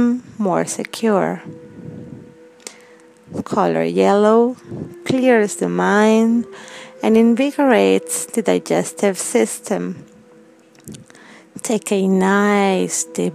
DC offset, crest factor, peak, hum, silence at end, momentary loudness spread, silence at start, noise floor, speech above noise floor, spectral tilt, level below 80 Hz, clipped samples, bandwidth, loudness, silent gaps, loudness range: under 0.1%; 18 dB; 0 dBFS; none; 0 s; 22 LU; 0 s; -47 dBFS; 31 dB; -5 dB/octave; -64 dBFS; under 0.1%; 15.5 kHz; -17 LUFS; none; 7 LU